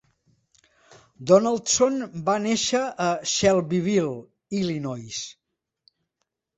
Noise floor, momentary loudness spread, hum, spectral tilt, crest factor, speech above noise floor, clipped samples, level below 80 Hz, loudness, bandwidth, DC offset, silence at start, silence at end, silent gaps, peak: -79 dBFS; 14 LU; none; -4 dB/octave; 22 dB; 57 dB; under 0.1%; -60 dBFS; -23 LUFS; 8.2 kHz; under 0.1%; 1.2 s; 1.25 s; none; -2 dBFS